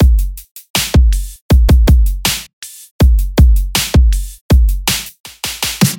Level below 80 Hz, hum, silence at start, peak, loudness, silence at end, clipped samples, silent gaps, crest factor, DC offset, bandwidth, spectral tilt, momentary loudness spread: -12 dBFS; none; 0 s; 0 dBFS; -13 LUFS; 0 s; under 0.1%; 0.51-0.55 s, 0.70-0.74 s, 1.41-1.49 s, 2.53-2.62 s, 2.91-2.99 s, 4.41-4.49 s, 5.20-5.24 s; 12 dB; under 0.1%; 17 kHz; -4.5 dB/octave; 14 LU